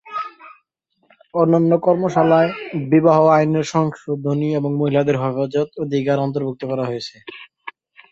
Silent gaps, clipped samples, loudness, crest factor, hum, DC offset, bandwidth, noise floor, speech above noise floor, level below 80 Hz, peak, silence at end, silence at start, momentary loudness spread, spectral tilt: none; under 0.1%; -18 LUFS; 18 dB; none; under 0.1%; 7.8 kHz; -67 dBFS; 49 dB; -62 dBFS; -2 dBFS; 0.4 s; 0.05 s; 18 LU; -7.5 dB/octave